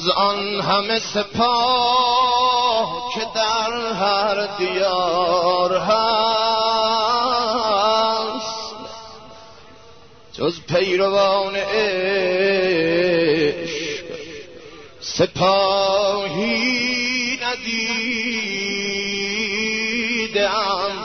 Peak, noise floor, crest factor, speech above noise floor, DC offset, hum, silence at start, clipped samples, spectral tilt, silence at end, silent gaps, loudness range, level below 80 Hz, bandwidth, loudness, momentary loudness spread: -4 dBFS; -46 dBFS; 16 dB; 28 dB; 0.3%; none; 0 s; under 0.1%; -3.5 dB/octave; 0 s; none; 4 LU; -54 dBFS; 6.6 kHz; -19 LUFS; 8 LU